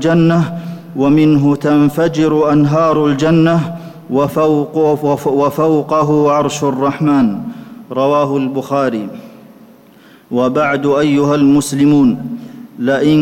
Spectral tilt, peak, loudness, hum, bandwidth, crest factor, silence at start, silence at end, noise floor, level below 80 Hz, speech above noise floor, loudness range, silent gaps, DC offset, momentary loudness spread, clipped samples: -7 dB/octave; -4 dBFS; -13 LUFS; none; 16 kHz; 10 dB; 0 s; 0 s; -43 dBFS; -48 dBFS; 31 dB; 5 LU; none; under 0.1%; 13 LU; under 0.1%